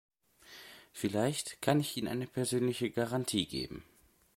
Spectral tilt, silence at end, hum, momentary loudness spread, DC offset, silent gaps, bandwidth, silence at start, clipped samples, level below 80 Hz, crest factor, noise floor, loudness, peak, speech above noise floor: -4.5 dB/octave; 0.55 s; none; 19 LU; under 0.1%; none; 16.5 kHz; 0.45 s; under 0.1%; -64 dBFS; 24 dB; -57 dBFS; -34 LUFS; -12 dBFS; 24 dB